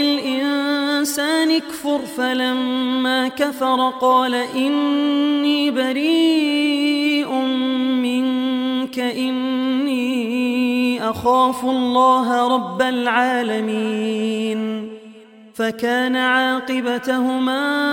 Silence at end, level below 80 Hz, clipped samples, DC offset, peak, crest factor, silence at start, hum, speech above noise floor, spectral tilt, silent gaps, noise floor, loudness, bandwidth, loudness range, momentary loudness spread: 0 s; -62 dBFS; under 0.1%; under 0.1%; -4 dBFS; 14 dB; 0 s; none; 25 dB; -3.5 dB/octave; none; -43 dBFS; -19 LUFS; 17 kHz; 3 LU; 6 LU